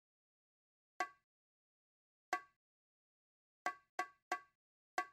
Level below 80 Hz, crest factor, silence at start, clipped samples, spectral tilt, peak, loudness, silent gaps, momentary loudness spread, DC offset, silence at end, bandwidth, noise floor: under -90 dBFS; 26 dB; 1 s; under 0.1%; -0.5 dB/octave; -24 dBFS; -46 LUFS; 1.23-2.32 s, 2.56-3.65 s, 3.89-3.98 s, 4.22-4.31 s, 4.55-4.98 s; 2 LU; under 0.1%; 0.05 s; 14.5 kHz; under -90 dBFS